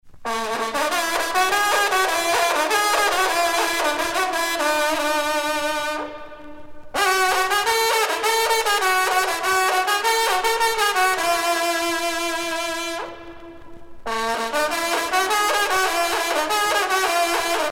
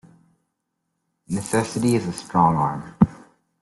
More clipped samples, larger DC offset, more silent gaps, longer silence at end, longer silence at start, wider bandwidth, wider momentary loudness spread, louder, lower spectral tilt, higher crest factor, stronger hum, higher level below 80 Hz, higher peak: neither; neither; neither; second, 0 s vs 0.5 s; second, 0.05 s vs 1.3 s; first, 17 kHz vs 12.5 kHz; about the same, 7 LU vs 7 LU; about the same, -20 LUFS vs -22 LUFS; second, 0 dB/octave vs -6.5 dB/octave; about the same, 18 dB vs 22 dB; neither; about the same, -52 dBFS vs -50 dBFS; about the same, -4 dBFS vs -2 dBFS